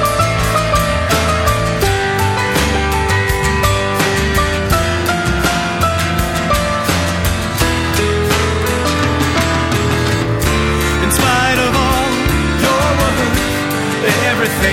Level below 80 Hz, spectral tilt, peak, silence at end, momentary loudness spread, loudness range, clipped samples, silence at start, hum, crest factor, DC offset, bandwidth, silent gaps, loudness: -24 dBFS; -4.5 dB/octave; 0 dBFS; 0 s; 3 LU; 1 LU; under 0.1%; 0 s; none; 14 dB; under 0.1%; 17.5 kHz; none; -14 LUFS